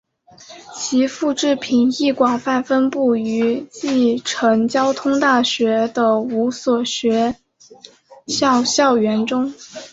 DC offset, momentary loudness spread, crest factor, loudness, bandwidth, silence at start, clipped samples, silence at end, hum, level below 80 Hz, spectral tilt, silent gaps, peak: under 0.1%; 7 LU; 16 dB; -18 LUFS; 8 kHz; 0.4 s; under 0.1%; 0.05 s; none; -60 dBFS; -3.5 dB/octave; none; -2 dBFS